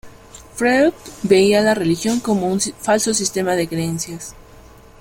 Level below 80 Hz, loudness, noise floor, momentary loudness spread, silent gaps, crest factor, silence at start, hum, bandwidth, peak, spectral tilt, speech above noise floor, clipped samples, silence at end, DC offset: -48 dBFS; -18 LUFS; -43 dBFS; 14 LU; none; 18 dB; 0.05 s; none; 16.5 kHz; -2 dBFS; -4 dB/octave; 26 dB; under 0.1%; 0.6 s; under 0.1%